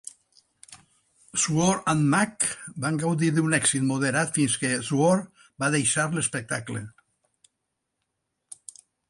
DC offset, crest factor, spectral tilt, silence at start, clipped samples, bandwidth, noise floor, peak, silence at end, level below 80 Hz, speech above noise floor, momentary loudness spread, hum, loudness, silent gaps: under 0.1%; 18 dB; -4 dB/octave; 0.7 s; under 0.1%; 11.5 kHz; -80 dBFS; -10 dBFS; 2.2 s; -62 dBFS; 56 dB; 19 LU; none; -24 LUFS; none